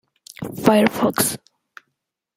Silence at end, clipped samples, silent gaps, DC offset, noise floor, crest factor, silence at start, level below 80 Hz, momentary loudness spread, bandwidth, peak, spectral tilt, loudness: 1 s; under 0.1%; none; under 0.1%; -77 dBFS; 20 dB; 0.4 s; -56 dBFS; 18 LU; 16 kHz; -2 dBFS; -4 dB/octave; -18 LUFS